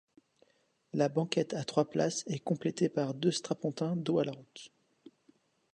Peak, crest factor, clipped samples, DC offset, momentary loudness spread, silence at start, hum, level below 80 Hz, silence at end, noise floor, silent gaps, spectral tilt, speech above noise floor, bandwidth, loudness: -14 dBFS; 20 dB; under 0.1%; under 0.1%; 9 LU; 0.95 s; none; -78 dBFS; 1.1 s; -70 dBFS; none; -5.5 dB/octave; 37 dB; 11 kHz; -33 LUFS